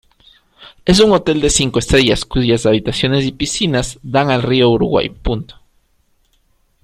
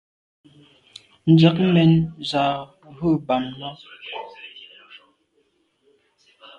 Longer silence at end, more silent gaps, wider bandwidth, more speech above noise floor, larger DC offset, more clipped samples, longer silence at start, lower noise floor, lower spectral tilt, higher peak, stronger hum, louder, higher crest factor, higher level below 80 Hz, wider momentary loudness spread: second, 1.3 s vs 2 s; neither; first, 15 kHz vs 8.6 kHz; about the same, 45 dB vs 47 dB; neither; neither; second, 0.6 s vs 1.25 s; second, -59 dBFS vs -66 dBFS; second, -4.5 dB/octave vs -8 dB/octave; first, 0 dBFS vs -4 dBFS; neither; first, -14 LUFS vs -19 LUFS; about the same, 16 dB vs 20 dB; first, -32 dBFS vs -56 dBFS; second, 9 LU vs 24 LU